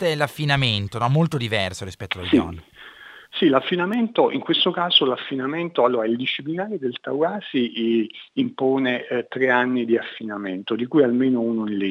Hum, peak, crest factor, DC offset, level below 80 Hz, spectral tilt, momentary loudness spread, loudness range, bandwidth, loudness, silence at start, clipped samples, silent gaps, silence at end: none; -2 dBFS; 18 dB; under 0.1%; -56 dBFS; -6 dB/octave; 10 LU; 3 LU; 14 kHz; -21 LUFS; 0 s; under 0.1%; none; 0 s